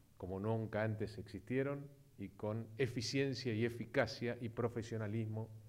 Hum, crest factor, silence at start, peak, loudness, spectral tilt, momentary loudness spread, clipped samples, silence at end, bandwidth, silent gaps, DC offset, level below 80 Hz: none; 20 dB; 0.2 s; -22 dBFS; -41 LUFS; -6 dB/octave; 9 LU; under 0.1%; 0 s; 15.5 kHz; none; under 0.1%; -70 dBFS